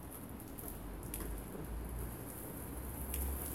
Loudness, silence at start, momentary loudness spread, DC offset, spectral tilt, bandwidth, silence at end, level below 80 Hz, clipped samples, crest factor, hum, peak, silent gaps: -45 LUFS; 0 s; 7 LU; under 0.1%; -5 dB/octave; 17 kHz; 0 s; -46 dBFS; under 0.1%; 22 dB; none; -22 dBFS; none